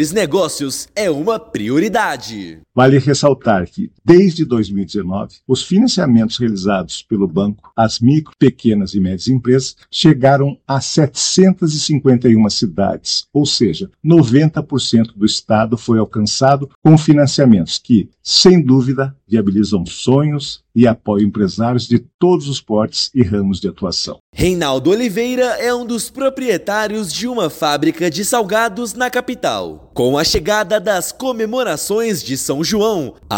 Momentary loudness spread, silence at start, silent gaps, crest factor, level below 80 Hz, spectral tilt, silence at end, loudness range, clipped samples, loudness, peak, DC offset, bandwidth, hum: 9 LU; 0 s; 16.75-16.82 s, 22.14-22.19 s, 24.20-24.33 s; 14 dB; -44 dBFS; -5.5 dB/octave; 0 s; 4 LU; 0.2%; -15 LUFS; 0 dBFS; under 0.1%; 17 kHz; none